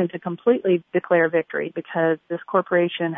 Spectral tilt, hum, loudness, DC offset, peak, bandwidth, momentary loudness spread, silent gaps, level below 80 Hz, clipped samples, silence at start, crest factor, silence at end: -10.5 dB/octave; none; -22 LUFS; under 0.1%; -6 dBFS; 3.8 kHz; 8 LU; none; -76 dBFS; under 0.1%; 0 s; 16 dB; 0 s